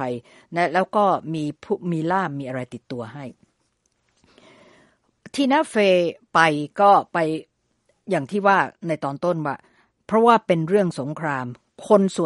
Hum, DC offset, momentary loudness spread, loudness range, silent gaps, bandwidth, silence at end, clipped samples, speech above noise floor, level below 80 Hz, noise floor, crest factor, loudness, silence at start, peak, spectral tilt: none; under 0.1%; 16 LU; 9 LU; none; 11.5 kHz; 0 s; under 0.1%; 49 dB; -68 dBFS; -70 dBFS; 22 dB; -21 LUFS; 0 s; 0 dBFS; -6 dB/octave